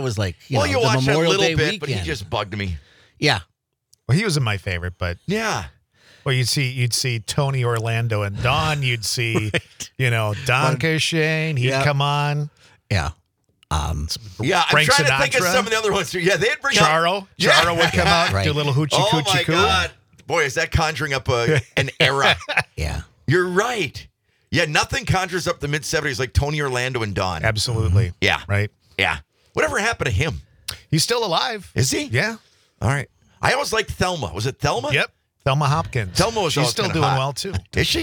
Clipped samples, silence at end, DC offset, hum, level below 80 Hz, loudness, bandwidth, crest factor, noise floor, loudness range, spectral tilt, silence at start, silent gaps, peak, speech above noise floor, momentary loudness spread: under 0.1%; 0 s; under 0.1%; none; -42 dBFS; -20 LUFS; 19.5 kHz; 18 dB; -62 dBFS; 6 LU; -4 dB/octave; 0 s; none; -2 dBFS; 42 dB; 10 LU